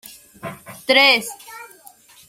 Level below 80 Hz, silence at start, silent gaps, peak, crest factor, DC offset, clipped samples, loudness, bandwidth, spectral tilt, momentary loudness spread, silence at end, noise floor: -66 dBFS; 0.45 s; none; 0 dBFS; 22 dB; under 0.1%; under 0.1%; -14 LUFS; 16.5 kHz; -1.5 dB/octave; 25 LU; 0.65 s; -48 dBFS